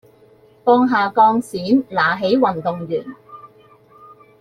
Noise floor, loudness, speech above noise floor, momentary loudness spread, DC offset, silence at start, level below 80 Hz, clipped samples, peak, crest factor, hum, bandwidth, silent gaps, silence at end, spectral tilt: -50 dBFS; -17 LUFS; 34 dB; 11 LU; under 0.1%; 0.65 s; -60 dBFS; under 0.1%; -2 dBFS; 16 dB; none; 12.5 kHz; none; 0.95 s; -6.5 dB/octave